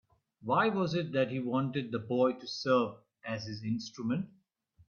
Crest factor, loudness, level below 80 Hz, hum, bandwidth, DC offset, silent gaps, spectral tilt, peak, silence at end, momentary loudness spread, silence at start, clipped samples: 18 dB; -32 LUFS; -72 dBFS; none; 7.2 kHz; under 0.1%; none; -6.5 dB/octave; -14 dBFS; 0.6 s; 10 LU; 0.4 s; under 0.1%